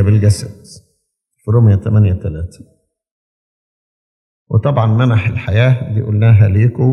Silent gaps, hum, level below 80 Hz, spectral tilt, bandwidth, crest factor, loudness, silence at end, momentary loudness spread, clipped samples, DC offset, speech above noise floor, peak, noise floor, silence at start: 3.11-4.46 s; none; -44 dBFS; -8 dB/octave; 11 kHz; 14 dB; -13 LUFS; 0 s; 13 LU; under 0.1%; under 0.1%; 55 dB; 0 dBFS; -67 dBFS; 0 s